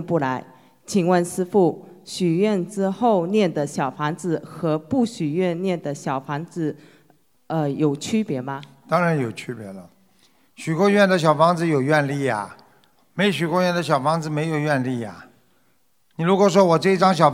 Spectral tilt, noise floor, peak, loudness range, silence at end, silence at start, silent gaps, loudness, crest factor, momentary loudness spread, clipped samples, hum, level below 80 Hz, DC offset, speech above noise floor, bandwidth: -6 dB/octave; -66 dBFS; 0 dBFS; 5 LU; 0 s; 0 s; none; -21 LUFS; 22 dB; 15 LU; under 0.1%; none; -68 dBFS; under 0.1%; 45 dB; 15.5 kHz